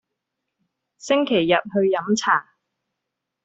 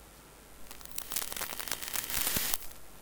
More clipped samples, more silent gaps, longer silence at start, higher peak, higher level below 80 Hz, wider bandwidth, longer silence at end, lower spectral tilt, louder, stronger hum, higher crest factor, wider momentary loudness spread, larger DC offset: neither; neither; first, 1.05 s vs 0 s; first, -4 dBFS vs -8 dBFS; second, -66 dBFS vs -54 dBFS; second, 8 kHz vs 19.5 kHz; first, 1 s vs 0 s; first, -4.5 dB/octave vs -0.5 dB/octave; first, -20 LUFS vs -33 LUFS; neither; second, 20 dB vs 30 dB; second, 4 LU vs 24 LU; neither